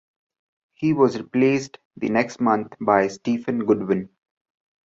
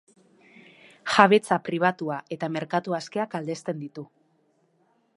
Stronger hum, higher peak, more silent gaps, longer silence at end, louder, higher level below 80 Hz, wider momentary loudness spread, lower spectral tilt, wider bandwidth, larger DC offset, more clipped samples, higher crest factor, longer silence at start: neither; second, -4 dBFS vs 0 dBFS; first, 1.85-1.91 s vs none; second, 0.8 s vs 1.1 s; first, -22 LUFS vs -25 LUFS; first, -62 dBFS vs -74 dBFS; second, 7 LU vs 18 LU; first, -6.5 dB/octave vs -5 dB/octave; second, 7.8 kHz vs 11.5 kHz; neither; neither; second, 20 dB vs 26 dB; second, 0.8 s vs 1.05 s